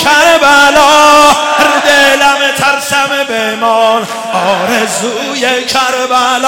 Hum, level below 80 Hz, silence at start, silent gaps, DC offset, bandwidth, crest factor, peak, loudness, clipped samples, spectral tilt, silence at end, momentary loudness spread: none; -42 dBFS; 0 s; none; under 0.1%; 17.5 kHz; 8 dB; 0 dBFS; -8 LUFS; 0.1%; -1.5 dB/octave; 0 s; 8 LU